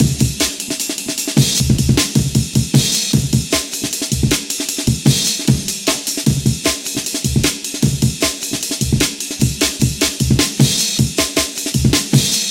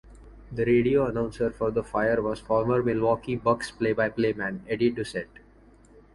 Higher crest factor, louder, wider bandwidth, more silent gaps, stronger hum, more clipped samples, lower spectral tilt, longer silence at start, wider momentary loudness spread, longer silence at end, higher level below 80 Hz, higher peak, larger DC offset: about the same, 16 dB vs 18 dB; first, -16 LUFS vs -26 LUFS; first, 17 kHz vs 11.5 kHz; neither; neither; neither; second, -3.5 dB/octave vs -7 dB/octave; about the same, 0 s vs 0.05 s; second, 5 LU vs 8 LU; second, 0 s vs 0.9 s; first, -30 dBFS vs -50 dBFS; first, 0 dBFS vs -8 dBFS; neither